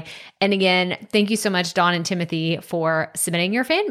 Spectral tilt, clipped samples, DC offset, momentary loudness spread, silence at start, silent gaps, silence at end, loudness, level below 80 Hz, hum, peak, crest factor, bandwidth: -4 dB/octave; under 0.1%; under 0.1%; 6 LU; 0 s; none; 0 s; -20 LUFS; -68 dBFS; none; -6 dBFS; 16 dB; 16 kHz